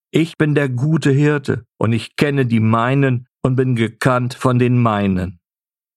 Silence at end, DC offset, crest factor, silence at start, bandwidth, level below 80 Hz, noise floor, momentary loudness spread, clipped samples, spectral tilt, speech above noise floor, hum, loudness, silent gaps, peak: 0.65 s; under 0.1%; 16 dB; 0.15 s; 12.5 kHz; -50 dBFS; under -90 dBFS; 6 LU; under 0.1%; -7.5 dB/octave; over 74 dB; none; -17 LUFS; none; -2 dBFS